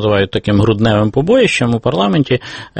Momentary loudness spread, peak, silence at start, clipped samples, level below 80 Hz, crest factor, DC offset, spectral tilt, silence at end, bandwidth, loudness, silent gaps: 4 LU; 0 dBFS; 0 s; under 0.1%; -38 dBFS; 12 dB; under 0.1%; -6.5 dB/octave; 0 s; 8.8 kHz; -13 LUFS; none